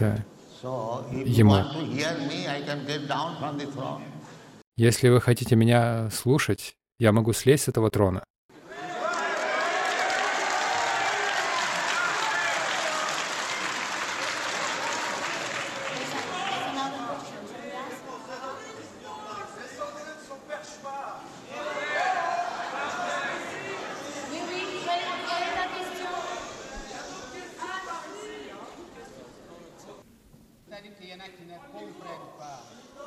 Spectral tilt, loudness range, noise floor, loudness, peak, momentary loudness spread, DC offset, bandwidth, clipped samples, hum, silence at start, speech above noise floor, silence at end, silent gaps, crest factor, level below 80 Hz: -5 dB/octave; 16 LU; -55 dBFS; -27 LUFS; -6 dBFS; 21 LU; under 0.1%; 16.5 kHz; under 0.1%; none; 0 s; 32 dB; 0 s; 4.67-4.72 s, 8.30-8.49 s; 22 dB; -58 dBFS